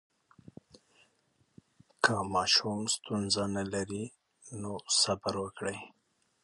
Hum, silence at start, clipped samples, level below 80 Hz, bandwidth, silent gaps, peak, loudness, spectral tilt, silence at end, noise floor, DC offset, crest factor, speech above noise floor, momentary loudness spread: none; 2 s; under 0.1%; -62 dBFS; 11.5 kHz; none; -10 dBFS; -31 LUFS; -2.5 dB/octave; 0.55 s; -73 dBFS; under 0.1%; 24 dB; 40 dB; 16 LU